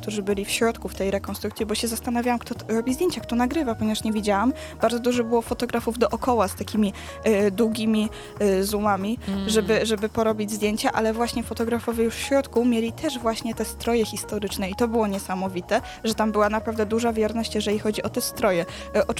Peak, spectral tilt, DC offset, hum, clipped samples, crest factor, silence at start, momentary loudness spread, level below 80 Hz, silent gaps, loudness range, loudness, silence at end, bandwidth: -6 dBFS; -4.5 dB/octave; under 0.1%; none; under 0.1%; 18 dB; 0 s; 5 LU; -44 dBFS; none; 2 LU; -24 LUFS; 0 s; 16.5 kHz